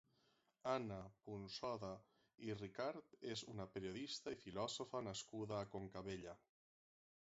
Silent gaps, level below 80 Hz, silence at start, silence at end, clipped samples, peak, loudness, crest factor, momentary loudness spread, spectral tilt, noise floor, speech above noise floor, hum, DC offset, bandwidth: none; -76 dBFS; 0.65 s; 1 s; under 0.1%; -28 dBFS; -49 LUFS; 22 dB; 9 LU; -4 dB/octave; -81 dBFS; 32 dB; none; under 0.1%; 7.6 kHz